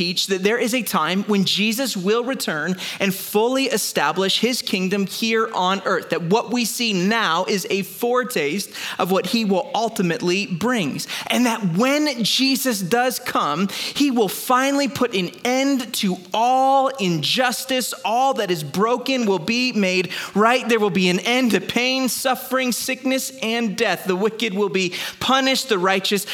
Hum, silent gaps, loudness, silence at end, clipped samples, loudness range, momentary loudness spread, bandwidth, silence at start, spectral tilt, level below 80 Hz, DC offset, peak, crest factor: none; none; -20 LUFS; 0 s; under 0.1%; 2 LU; 5 LU; 18.5 kHz; 0 s; -3.5 dB/octave; -66 dBFS; under 0.1%; -2 dBFS; 18 dB